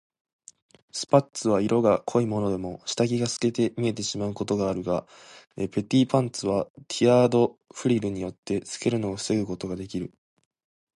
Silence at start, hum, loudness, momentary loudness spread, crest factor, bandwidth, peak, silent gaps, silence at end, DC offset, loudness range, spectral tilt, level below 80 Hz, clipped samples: 0.95 s; none; -26 LUFS; 11 LU; 20 dB; 11.5 kHz; -6 dBFS; 6.70-6.75 s, 8.38-8.43 s; 0.9 s; under 0.1%; 3 LU; -5.5 dB/octave; -56 dBFS; under 0.1%